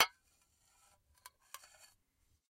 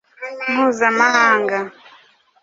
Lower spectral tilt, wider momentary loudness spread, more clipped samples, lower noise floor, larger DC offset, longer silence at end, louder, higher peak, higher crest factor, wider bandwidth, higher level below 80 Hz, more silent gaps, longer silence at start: second, 2 dB/octave vs -3 dB/octave; first, 19 LU vs 15 LU; neither; first, -77 dBFS vs -51 dBFS; neither; first, 2.45 s vs 0.75 s; second, -38 LUFS vs -16 LUFS; second, -10 dBFS vs -2 dBFS; first, 34 dB vs 18 dB; first, 16 kHz vs 7.8 kHz; second, -82 dBFS vs -68 dBFS; neither; second, 0 s vs 0.2 s